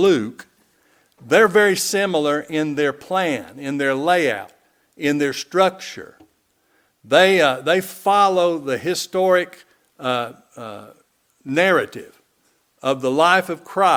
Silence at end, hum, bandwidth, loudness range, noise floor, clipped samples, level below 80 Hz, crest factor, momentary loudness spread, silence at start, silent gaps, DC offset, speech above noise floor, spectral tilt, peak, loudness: 0 s; none; 19.5 kHz; 5 LU; -64 dBFS; under 0.1%; -66 dBFS; 20 dB; 17 LU; 0 s; none; under 0.1%; 45 dB; -4 dB/octave; 0 dBFS; -18 LUFS